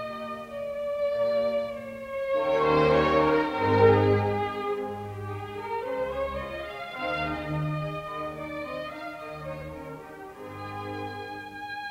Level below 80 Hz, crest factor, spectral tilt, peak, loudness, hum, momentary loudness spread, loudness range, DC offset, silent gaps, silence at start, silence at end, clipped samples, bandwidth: -52 dBFS; 22 dB; -7.5 dB/octave; -6 dBFS; -28 LUFS; none; 16 LU; 13 LU; under 0.1%; none; 0 s; 0 s; under 0.1%; 15.5 kHz